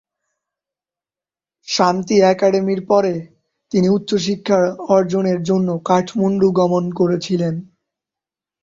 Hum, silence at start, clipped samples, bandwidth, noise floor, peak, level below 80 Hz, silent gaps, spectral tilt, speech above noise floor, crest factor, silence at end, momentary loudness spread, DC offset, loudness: none; 1.65 s; under 0.1%; 7.6 kHz; under -90 dBFS; -2 dBFS; -58 dBFS; none; -6 dB/octave; over 74 dB; 16 dB; 1 s; 6 LU; under 0.1%; -17 LUFS